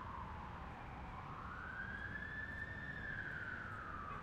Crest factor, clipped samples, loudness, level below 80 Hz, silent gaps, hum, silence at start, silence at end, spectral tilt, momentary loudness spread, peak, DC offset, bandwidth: 14 dB; under 0.1%; -47 LUFS; -58 dBFS; none; none; 0 s; 0 s; -6.5 dB/octave; 5 LU; -34 dBFS; under 0.1%; 15.5 kHz